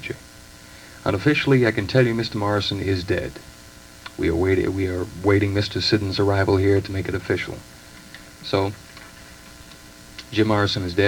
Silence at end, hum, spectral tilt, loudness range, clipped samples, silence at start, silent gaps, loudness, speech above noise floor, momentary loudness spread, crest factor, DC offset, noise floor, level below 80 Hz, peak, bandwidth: 0 s; none; -6 dB/octave; 7 LU; under 0.1%; 0 s; none; -21 LUFS; 23 dB; 23 LU; 20 dB; under 0.1%; -44 dBFS; -48 dBFS; -4 dBFS; 19.5 kHz